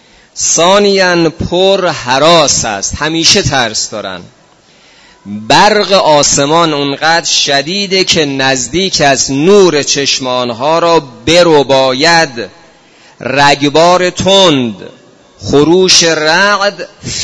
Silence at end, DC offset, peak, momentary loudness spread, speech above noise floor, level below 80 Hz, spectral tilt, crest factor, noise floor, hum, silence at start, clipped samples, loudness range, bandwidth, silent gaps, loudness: 0 s; under 0.1%; 0 dBFS; 9 LU; 35 dB; -38 dBFS; -3 dB/octave; 10 dB; -44 dBFS; none; 0.35 s; 1%; 2 LU; 11 kHz; none; -8 LUFS